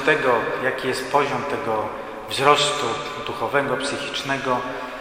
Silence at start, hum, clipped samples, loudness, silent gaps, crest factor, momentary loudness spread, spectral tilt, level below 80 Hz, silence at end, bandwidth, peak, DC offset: 0 s; none; under 0.1%; -22 LUFS; none; 22 dB; 10 LU; -3.5 dB/octave; -54 dBFS; 0 s; 16 kHz; 0 dBFS; under 0.1%